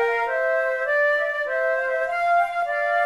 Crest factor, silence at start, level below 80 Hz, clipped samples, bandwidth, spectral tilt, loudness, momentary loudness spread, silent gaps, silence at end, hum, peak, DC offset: 12 dB; 0 s; -62 dBFS; under 0.1%; 12.5 kHz; -1.5 dB/octave; -22 LUFS; 3 LU; none; 0 s; none; -10 dBFS; under 0.1%